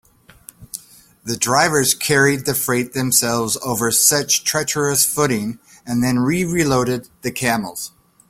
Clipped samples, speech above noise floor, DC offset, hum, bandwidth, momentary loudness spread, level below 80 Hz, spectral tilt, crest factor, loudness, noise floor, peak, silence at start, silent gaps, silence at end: under 0.1%; 27 dB; under 0.1%; none; 16.5 kHz; 16 LU; -50 dBFS; -3 dB/octave; 18 dB; -17 LUFS; -45 dBFS; 0 dBFS; 0.6 s; none; 0.4 s